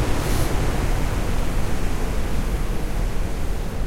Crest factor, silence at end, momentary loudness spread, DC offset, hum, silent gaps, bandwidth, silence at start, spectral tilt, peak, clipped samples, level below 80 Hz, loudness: 14 dB; 0 s; 5 LU; under 0.1%; none; none; 16 kHz; 0 s; -5.5 dB/octave; -6 dBFS; under 0.1%; -24 dBFS; -26 LUFS